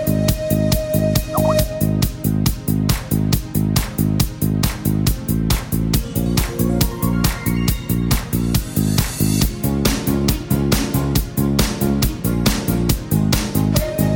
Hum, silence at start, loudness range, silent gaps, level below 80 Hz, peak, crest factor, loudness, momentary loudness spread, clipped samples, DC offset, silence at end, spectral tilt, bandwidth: none; 0 s; 1 LU; none; -26 dBFS; 0 dBFS; 18 dB; -19 LUFS; 2 LU; under 0.1%; under 0.1%; 0 s; -5.5 dB/octave; 17.5 kHz